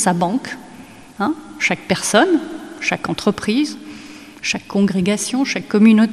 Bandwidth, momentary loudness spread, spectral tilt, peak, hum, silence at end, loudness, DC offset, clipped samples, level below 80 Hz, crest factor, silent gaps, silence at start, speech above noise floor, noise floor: 13 kHz; 18 LU; -4.5 dB/octave; 0 dBFS; none; 0 s; -18 LUFS; 0.2%; under 0.1%; -54 dBFS; 18 dB; none; 0 s; 23 dB; -39 dBFS